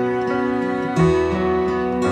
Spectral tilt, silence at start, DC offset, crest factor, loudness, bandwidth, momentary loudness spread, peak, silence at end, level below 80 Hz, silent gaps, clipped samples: -7.5 dB/octave; 0 s; under 0.1%; 14 dB; -20 LUFS; 9.4 kHz; 4 LU; -4 dBFS; 0 s; -40 dBFS; none; under 0.1%